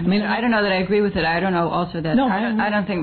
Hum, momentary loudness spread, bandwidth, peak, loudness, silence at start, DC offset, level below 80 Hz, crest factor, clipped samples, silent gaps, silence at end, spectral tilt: none; 2 LU; 4.6 kHz; -10 dBFS; -20 LUFS; 0 s; under 0.1%; -44 dBFS; 10 dB; under 0.1%; none; 0 s; -9.5 dB/octave